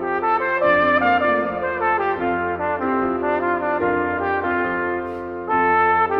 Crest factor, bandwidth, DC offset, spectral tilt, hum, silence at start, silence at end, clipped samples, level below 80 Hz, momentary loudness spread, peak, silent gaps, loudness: 16 dB; 5.8 kHz; under 0.1%; -8 dB/octave; none; 0 s; 0 s; under 0.1%; -50 dBFS; 7 LU; -4 dBFS; none; -20 LUFS